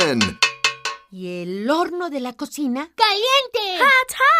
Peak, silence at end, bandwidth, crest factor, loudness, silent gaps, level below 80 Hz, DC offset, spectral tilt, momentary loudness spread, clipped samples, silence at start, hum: -2 dBFS; 0 s; 16 kHz; 18 dB; -19 LUFS; none; -58 dBFS; under 0.1%; -2.5 dB/octave; 14 LU; under 0.1%; 0 s; none